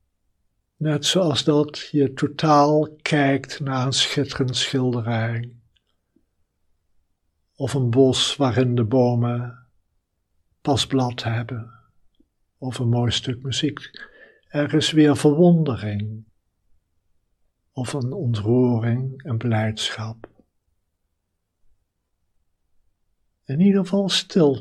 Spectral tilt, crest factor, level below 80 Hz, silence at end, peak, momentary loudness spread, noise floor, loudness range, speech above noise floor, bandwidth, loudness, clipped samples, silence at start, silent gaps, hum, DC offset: -5.5 dB/octave; 18 dB; -60 dBFS; 0 s; -4 dBFS; 14 LU; -75 dBFS; 7 LU; 55 dB; 12.5 kHz; -21 LUFS; under 0.1%; 0.8 s; none; none; under 0.1%